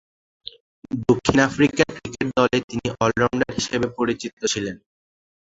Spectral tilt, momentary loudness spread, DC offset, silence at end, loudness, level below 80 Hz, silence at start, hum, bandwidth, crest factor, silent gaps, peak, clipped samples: -4.5 dB/octave; 17 LU; under 0.1%; 0.65 s; -22 LUFS; -48 dBFS; 0.9 s; none; 8 kHz; 22 dB; 2.64-2.68 s, 4.33-4.37 s; 0 dBFS; under 0.1%